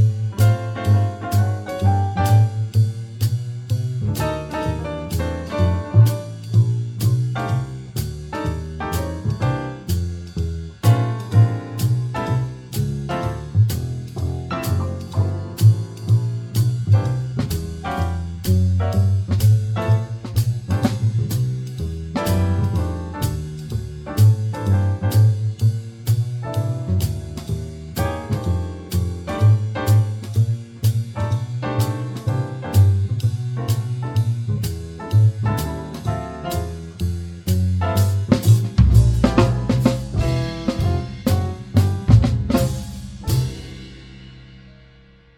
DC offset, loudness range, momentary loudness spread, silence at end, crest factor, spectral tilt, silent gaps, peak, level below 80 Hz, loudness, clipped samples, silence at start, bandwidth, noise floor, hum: under 0.1%; 5 LU; 10 LU; 0.65 s; 20 dB; -7 dB/octave; none; 0 dBFS; -32 dBFS; -21 LUFS; under 0.1%; 0 s; 17 kHz; -49 dBFS; none